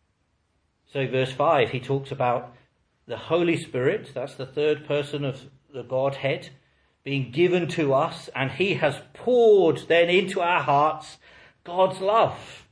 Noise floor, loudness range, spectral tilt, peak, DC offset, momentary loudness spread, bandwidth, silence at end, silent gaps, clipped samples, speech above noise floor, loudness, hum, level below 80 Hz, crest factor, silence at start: -70 dBFS; 6 LU; -6 dB/octave; -6 dBFS; under 0.1%; 14 LU; 10.5 kHz; 0.15 s; none; under 0.1%; 47 dB; -23 LUFS; none; -66 dBFS; 18 dB; 0.95 s